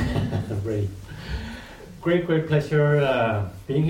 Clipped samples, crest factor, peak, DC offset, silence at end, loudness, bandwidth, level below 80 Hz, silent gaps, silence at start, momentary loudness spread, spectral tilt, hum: under 0.1%; 16 dB; -8 dBFS; under 0.1%; 0 s; -24 LUFS; 11.5 kHz; -40 dBFS; none; 0 s; 16 LU; -7.5 dB/octave; none